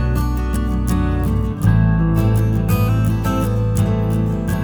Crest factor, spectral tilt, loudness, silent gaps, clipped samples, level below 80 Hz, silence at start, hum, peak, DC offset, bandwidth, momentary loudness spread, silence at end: 14 dB; -8 dB/octave; -18 LUFS; none; under 0.1%; -22 dBFS; 0 s; none; -4 dBFS; under 0.1%; over 20 kHz; 4 LU; 0 s